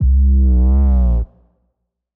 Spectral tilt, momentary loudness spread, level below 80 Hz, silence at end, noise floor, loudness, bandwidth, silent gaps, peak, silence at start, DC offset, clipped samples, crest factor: -13.5 dB/octave; 8 LU; -14 dBFS; 0.9 s; -71 dBFS; -15 LUFS; 1.4 kHz; none; -8 dBFS; 0 s; under 0.1%; under 0.1%; 6 dB